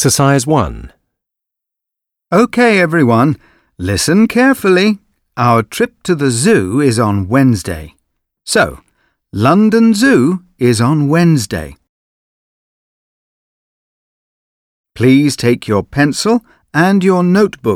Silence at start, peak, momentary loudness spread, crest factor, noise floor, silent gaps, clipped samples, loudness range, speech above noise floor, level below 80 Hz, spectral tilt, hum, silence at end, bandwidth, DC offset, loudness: 0 s; 0 dBFS; 11 LU; 12 dB; -81 dBFS; 11.89-14.84 s; under 0.1%; 5 LU; 70 dB; -42 dBFS; -5.5 dB/octave; none; 0 s; 16.5 kHz; under 0.1%; -12 LUFS